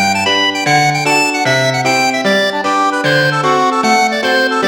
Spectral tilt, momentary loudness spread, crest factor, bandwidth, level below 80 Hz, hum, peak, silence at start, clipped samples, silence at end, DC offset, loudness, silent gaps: -3.5 dB/octave; 2 LU; 12 dB; 17.5 kHz; -54 dBFS; none; 0 dBFS; 0 s; under 0.1%; 0 s; under 0.1%; -12 LUFS; none